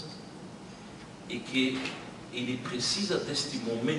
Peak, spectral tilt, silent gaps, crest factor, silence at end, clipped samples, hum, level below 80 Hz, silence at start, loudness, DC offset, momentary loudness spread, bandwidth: -14 dBFS; -3.5 dB/octave; none; 20 dB; 0 s; under 0.1%; none; -64 dBFS; 0 s; -32 LUFS; under 0.1%; 17 LU; 11.5 kHz